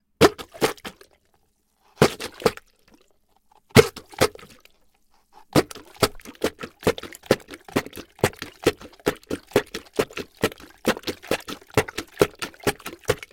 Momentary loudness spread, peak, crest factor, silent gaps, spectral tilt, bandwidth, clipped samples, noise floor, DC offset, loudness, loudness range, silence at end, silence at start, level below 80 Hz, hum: 10 LU; 0 dBFS; 26 dB; none; -4.5 dB/octave; 17 kHz; under 0.1%; -66 dBFS; under 0.1%; -25 LUFS; 4 LU; 0.15 s; 0.2 s; -52 dBFS; none